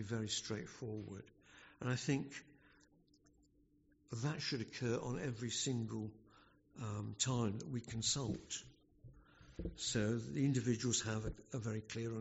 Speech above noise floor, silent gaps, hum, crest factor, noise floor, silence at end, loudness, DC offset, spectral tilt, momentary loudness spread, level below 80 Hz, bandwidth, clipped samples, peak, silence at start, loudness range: 32 dB; none; none; 20 dB; -72 dBFS; 0 s; -41 LUFS; under 0.1%; -5 dB/octave; 13 LU; -62 dBFS; 8 kHz; under 0.1%; -22 dBFS; 0 s; 5 LU